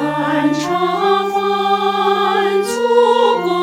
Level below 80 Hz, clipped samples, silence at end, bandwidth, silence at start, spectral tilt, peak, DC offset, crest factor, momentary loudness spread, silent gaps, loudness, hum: -62 dBFS; under 0.1%; 0 s; 16 kHz; 0 s; -4.5 dB/octave; -2 dBFS; under 0.1%; 14 dB; 4 LU; none; -15 LUFS; none